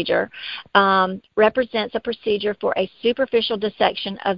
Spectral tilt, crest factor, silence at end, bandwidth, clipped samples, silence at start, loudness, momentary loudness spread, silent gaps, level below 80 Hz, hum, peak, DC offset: -8 dB/octave; 20 dB; 0 s; 5.6 kHz; under 0.1%; 0 s; -20 LUFS; 8 LU; none; -56 dBFS; none; 0 dBFS; under 0.1%